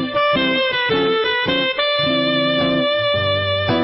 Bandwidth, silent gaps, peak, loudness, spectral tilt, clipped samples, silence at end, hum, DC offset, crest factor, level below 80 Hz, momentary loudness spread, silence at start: 5.8 kHz; none; -6 dBFS; -17 LUFS; -9 dB/octave; under 0.1%; 0 s; none; under 0.1%; 12 dB; -50 dBFS; 1 LU; 0 s